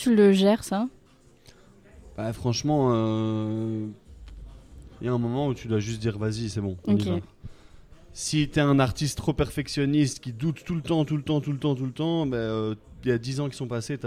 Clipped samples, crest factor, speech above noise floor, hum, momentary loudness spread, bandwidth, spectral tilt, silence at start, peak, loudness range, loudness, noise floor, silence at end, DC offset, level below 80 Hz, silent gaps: under 0.1%; 20 dB; 31 dB; none; 11 LU; 15 kHz; -6 dB/octave; 0 s; -6 dBFS; 4 LU; -26 LUFS; -56 dBFS; 0 s; under 0.1%; -48 dBFS; none